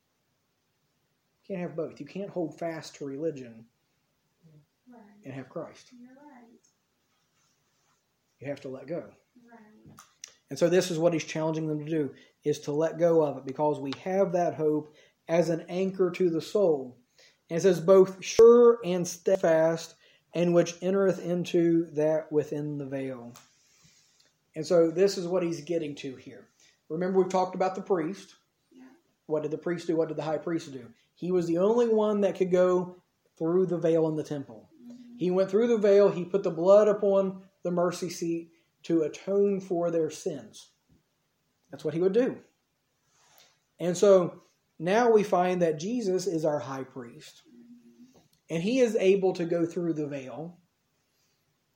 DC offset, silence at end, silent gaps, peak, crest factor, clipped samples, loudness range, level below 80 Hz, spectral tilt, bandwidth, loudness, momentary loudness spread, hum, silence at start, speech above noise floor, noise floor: under 0.1%; 1.25 s; none; -8 dBFS; 20 dB; under 0.1%; 17 LU; -74 dBFS; -6 dB/octave; 16.5 kHz; -27 LUFS; 17 LU; none; 1.5 s; 49 dB; -75 dBFS